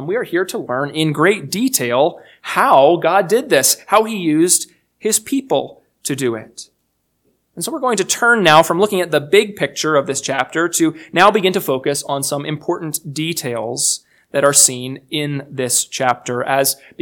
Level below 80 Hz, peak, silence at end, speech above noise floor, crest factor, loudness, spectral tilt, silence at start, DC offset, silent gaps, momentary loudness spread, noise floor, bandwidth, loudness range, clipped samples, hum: -62 dBFS; 0 dBFS; 0.25 s; 51 dB; 16 dB; -16 LUFS; -3 dB/octave; 0 s; under 0.1%; none; 12 LU; -68 dBFS; 19.5 kHz; 5 LU; under 0.1%; none